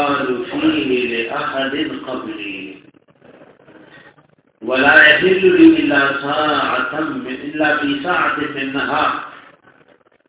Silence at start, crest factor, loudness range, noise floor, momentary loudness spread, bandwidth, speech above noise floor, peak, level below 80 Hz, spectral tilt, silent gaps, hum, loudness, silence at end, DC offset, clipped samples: 0 s; 18 dB; 12 LU; -53 dBFS; 17 LU; 4 kHz; 38 dB; 0 dBFS; -54 dBFS; -8 dB/octave; none; none; -15 LUFS; 0.9 s; under 0.1%; under 0.1%